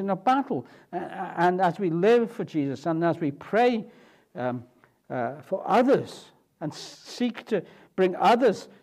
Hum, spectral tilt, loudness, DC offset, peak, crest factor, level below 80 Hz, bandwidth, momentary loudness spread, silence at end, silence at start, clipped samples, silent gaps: none; -6.5 dB/octave; -26 LUFS; under 0.1%; -10 dBFS; 16 dB; -76 dBFS; 14 kHz; 16 LU; 0.15 s; 0 s; under 0.1%; none